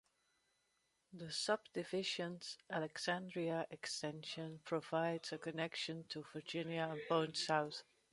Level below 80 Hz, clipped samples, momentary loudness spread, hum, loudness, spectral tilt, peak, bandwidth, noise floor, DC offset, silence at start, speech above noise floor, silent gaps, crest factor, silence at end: -84 dBFS; under 0.1%; 10 LU; none; -42 LUFS; -4 dB/octave; -20 dBFS; 11.5 kHz; -82 dBFS; under 0.1%; 1.1 s; 40 dB; none; 22 dB; 0.3 s